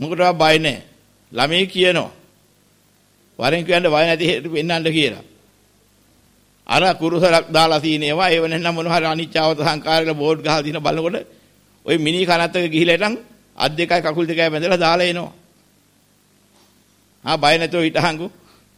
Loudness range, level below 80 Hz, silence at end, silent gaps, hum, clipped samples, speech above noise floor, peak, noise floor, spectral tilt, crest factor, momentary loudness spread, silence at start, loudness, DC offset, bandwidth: 4 LU; -54 dBFS; 0.5 s; none; none; under 0.1%; 39 dB; -2 dBFS; -57 dBFS; -4.5 dB/octave; 18 dB; 8 LU; 0 s; -17 LUFS; under 0.1%; 16 kHz